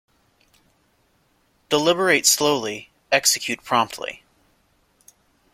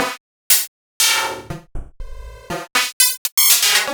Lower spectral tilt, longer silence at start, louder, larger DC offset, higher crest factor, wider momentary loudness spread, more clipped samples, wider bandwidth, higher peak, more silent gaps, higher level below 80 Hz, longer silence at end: first, -1.5 dB/octave vs 0.5 dB/octave; first, 1.7 s vs 0 s; second, -19 LUFS vs -14 LUFS; neither; about the same, 24 dB vs 20 dB; second, 15 LU vs 20 LU; neither; second, 16.5 kHz vs over 20 kHz; about the same, -2 dBFS vs 0 dBFS; second, none vs 0.20-0.50 s, 0.68-1.00 s, 2.93-3.00 s, 3.18-3.25 s, 3.32-3.37 s; second, -64 dBFS vs -38 dBFS; first, 1.35 s vs 0 s